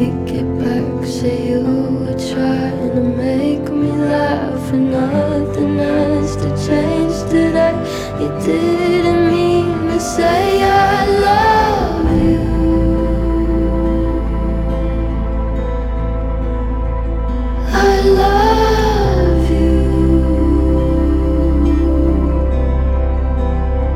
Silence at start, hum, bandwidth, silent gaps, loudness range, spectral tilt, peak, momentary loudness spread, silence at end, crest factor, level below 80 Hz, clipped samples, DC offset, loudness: 0 s; none; 13.5 kHz; none; 5 LU; -7 dB/octave; 0 dBFS; 8 LU; 0 s; 14 dB; -20 dBFS; under 0.1%; under 0.1%; -15 LUFS